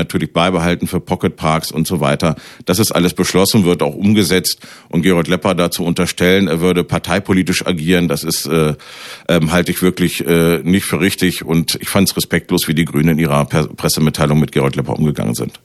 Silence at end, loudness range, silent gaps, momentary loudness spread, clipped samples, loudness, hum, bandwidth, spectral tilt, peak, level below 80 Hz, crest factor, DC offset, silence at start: 0.15 s; 1 LU; none; 5 LU; under 0.1%; -15 LUFS; none; 15.5 kHz; -5 dB/octave; 0 dBFS; -40 dBFS; 14 dB; under 0.1%; 0 s